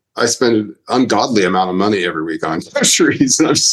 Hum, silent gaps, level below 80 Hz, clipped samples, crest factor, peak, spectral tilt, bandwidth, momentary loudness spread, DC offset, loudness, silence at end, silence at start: none; none; -56 dBFS; under 0.1%; 14 dB; 0 dBFS; -3 dB/octave; 13 kHz; 8 LU; under 0.1%; -14 LUFS; 0 s; 0.15 s